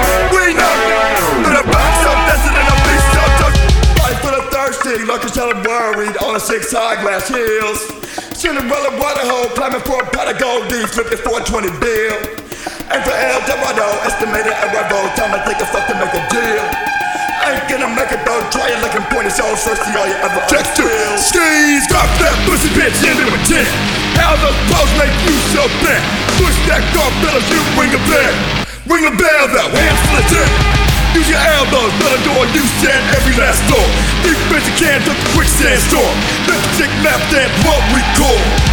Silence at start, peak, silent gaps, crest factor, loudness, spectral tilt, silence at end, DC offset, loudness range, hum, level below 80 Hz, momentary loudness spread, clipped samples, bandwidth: 0 s; 0 dBFS; none; 12 dB; -12 LUFS; -3.5 dB/octave; 0 s; under 0.1%; 5 LU; none; -20 dBFS; 6 LU; under 0.1%; over 20 kHz